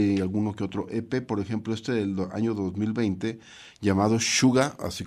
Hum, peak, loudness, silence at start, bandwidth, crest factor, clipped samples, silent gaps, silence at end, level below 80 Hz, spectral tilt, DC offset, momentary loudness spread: none; -8 dBFS; -26 LUFS; 0 s; 15 kHz; 18 dB; under 0.1%; none; 0 s; -58 dBFS; -5 dB/octave; under 0.1%; 10 LU